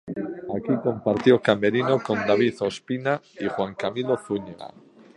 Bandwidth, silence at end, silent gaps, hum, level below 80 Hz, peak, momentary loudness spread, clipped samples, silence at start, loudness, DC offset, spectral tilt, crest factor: 11 kHz; 0.5 s; none; none; -62 dBFS; -2 dBFS; 12 LU; under 0.1%; 0.05 s; -24 LUFS; under 0.1%; -6.5 dB/octave; 22 dB